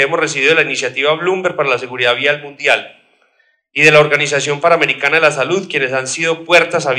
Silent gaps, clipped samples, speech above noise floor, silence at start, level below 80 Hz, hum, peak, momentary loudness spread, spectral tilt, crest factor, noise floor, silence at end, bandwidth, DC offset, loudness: none; under 0.1%; 45 dB; 0 s; -62 dBFS; none; 0 dBFS; 7 LU; -3 dB/octave; 14 dB; -58 dBFS; 0 s; 16 kHz; under 0.1%; -13 LUFS